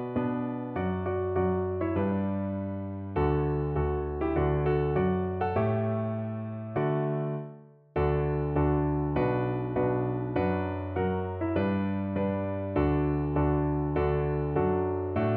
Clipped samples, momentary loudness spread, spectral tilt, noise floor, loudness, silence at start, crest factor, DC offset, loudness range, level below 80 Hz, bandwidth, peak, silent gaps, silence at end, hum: under 0.1%; 6 LU; -12 dB/octave; -48 dBFS; -29 LUFS; 0 s; 14 dB; under 0.1%; 2 LU; -40 dBFS; 4.3 kHz; -14 dBFS; none; 0 s; none